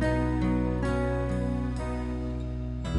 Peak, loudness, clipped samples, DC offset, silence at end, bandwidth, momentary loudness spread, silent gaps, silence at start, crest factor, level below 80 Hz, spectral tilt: -16 dBFS; -30 LUFS; under 0.1%; under 0.1%; 0 s; 11 kHz; 7 LU; none; 0 s; 12 dB; -34 dBFS; -8 dB/octave